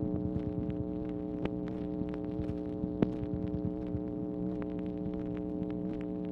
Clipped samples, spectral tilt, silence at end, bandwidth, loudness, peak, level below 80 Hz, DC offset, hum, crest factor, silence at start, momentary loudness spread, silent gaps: under 0.1%; -10.5 dB/octave; 0 s; 4.8 kHz; -36 LUFS; -12 dBFS; -50 dBFS; under 0.1%; none; 24 dB; 0 s; 4 LU; none